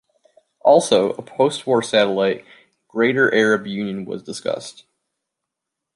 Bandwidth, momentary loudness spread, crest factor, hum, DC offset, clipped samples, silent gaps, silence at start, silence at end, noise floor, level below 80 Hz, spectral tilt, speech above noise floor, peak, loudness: 11.5 kHz; 14 LU; 18 dB; none; under 0.1%; under 0.1%; none; 0.65 s; 1.25 s; -82 dBFS; -66 dBFS; -4.5 dB/octave; 64 dB; -2 dBFS; -19 LUFS